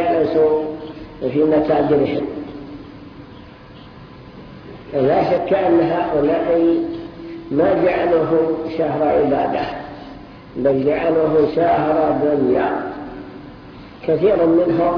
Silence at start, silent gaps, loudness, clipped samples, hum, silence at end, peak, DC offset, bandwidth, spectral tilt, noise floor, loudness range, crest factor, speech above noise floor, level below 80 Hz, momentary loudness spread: 0 s; none; -17 LUFS; under 0.1%; none; 0 s; -4 dBFS; under 0.1%; 5.4 kHz; -9.5 dB/octave; -39 dBFS; 5 LU; 14 dB; 23 dB; -46 dBFS; 21 LU